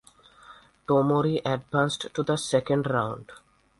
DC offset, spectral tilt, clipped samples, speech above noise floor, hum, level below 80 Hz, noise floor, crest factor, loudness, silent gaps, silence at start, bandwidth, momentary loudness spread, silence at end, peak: under 0.1%; -5.5 dB/octave; under 0.1%; 27 dB; none; -60 dBFS; -52 dBFS; 18 dB; -26 LUFS; none; 0.5 s; 11.5 kHz; 8 LU; 0.45 s; -8 dBFS